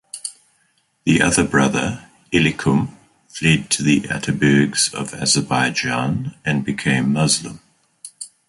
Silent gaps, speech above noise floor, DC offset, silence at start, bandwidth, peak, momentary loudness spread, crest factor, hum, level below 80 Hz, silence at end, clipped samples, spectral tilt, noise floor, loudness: none; 45 dB; under 0.1%; 0.15 s; 11.5 kHz; -2 dBFS; 15 LU; 18 dB; none; -46 dBFS; 0.2 s; under 0.1%; -4 dB/octave; -63 dBFS; -18 LUFS